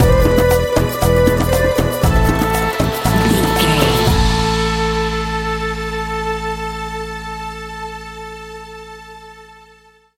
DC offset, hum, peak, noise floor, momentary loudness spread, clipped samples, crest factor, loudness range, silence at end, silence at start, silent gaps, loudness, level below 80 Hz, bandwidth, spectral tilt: under 0.1%; none; 0 dBFS; -48 dBFS; 17 LU; under 0.1%; 16 dB; 12 LU; 0.65 s; 0 s; none; -16 LUFS; -24 dBFS; 17 kHz; -5 dB/octave